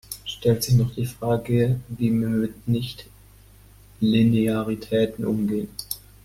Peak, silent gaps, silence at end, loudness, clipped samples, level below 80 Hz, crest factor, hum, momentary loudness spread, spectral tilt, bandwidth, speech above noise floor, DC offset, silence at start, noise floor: -6 dBFS; none; 0.3 s; -23 LUFS; under 0.1%; -48 dBFS; 16 dB; 50 Hz at -45 dBFS; 11 LU; -6.5 dB/octave; 16 kHz; 28 dB; under 0.1%; 0.1 s; -50 dBFS